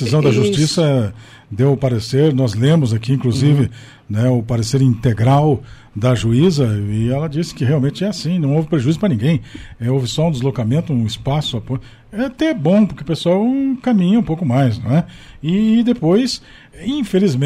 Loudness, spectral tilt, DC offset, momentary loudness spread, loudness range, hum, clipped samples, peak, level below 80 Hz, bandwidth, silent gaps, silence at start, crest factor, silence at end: -16 LUFS; -7 dB/octave; under 0.1%; 9 LU; 2 LU; none; under 0.1%; -4 dBFS; -42 dBFS; 13 kHz; none; 0 s; 12 dB; 0 s